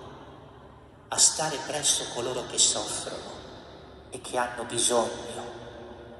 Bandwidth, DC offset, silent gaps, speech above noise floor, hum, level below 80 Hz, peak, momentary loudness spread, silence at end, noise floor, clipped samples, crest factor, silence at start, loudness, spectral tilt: 15 kHz; under 0.1%; none; 22 dB; none; -58 dBFS; -6 dBFS; 23 LU; 0 s; -50 dBFS; under 0.1%; 24 dB; 0 s; -25 LUFS; -1 dB/octave